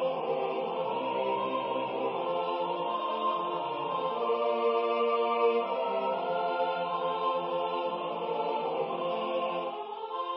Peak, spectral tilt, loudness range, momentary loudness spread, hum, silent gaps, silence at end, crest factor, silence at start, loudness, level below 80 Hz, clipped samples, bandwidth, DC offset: -14 dBFS; -2.5 dB/octave; 2 LU; 5 LU; none; none; 0 s; 16 dB; 0 s; -31 LUFS; -86 dBFS; under 0.1%; 5.6 kHz; under 0.1%